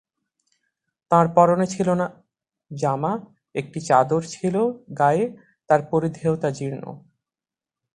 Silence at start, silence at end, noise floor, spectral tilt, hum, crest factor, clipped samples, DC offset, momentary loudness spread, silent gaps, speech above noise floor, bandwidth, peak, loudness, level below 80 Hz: 1.1 s; 0.95 s; under -90 dBFS; -7 dB/octave; none; 22 dB; under 0.1%; under 0.1%; 13 LU; none; over 69 dB; 10.5 kHz; -2 dBFS; -22 LUFS; -60 dBFS